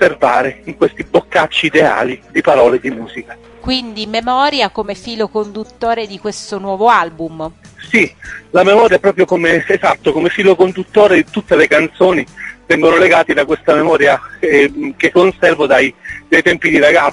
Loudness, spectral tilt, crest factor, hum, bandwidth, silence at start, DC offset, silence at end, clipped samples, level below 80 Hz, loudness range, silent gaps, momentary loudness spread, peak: -12 LUFS; -5 dB/octave; 12 dB; none; 11 kHz; 0 s; under 0.1%; 0 s; 0.4%; -44 dBFS; 6 LU; none; 13 LU; 0 dBFS